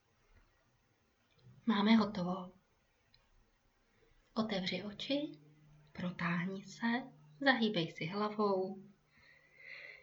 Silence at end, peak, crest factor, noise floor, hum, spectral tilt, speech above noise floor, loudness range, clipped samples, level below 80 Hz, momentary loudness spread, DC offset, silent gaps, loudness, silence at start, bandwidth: 0.05 s; -18 dBFS; 22 dB; -75 dBFS; none; -6 dB/octave; 40 dB; 6 LU; under 0.1%; -74 dBFS; 19 LU; under 0.1%; none; -36 LUFS; 1.45 s; 7.4 kHz